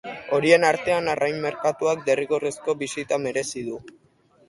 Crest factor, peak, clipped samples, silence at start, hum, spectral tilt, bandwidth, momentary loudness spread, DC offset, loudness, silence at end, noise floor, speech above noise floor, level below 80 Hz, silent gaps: 20 dB; -2 dBFS; under 0.1%; 0.05 s; none; -4 dB/octave; 11.5 kHz; 11 LU; under 0.1%; -23 LUFS; 0.6 s; -59 dBFS; 36 dB; -62 dBFS; none